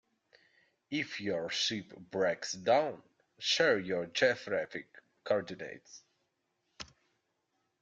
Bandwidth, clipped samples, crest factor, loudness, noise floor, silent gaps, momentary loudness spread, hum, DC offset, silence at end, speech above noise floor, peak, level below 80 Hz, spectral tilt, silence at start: 9 kHz; under 0.1%; 22 dB; -33 LUFS; -81 dBFS; none; 21 LU; none; under 0.1%; 0.95 s; 47 dB; -14 dBFS; -76 dBFS; -3 dB/octave; 0.9 s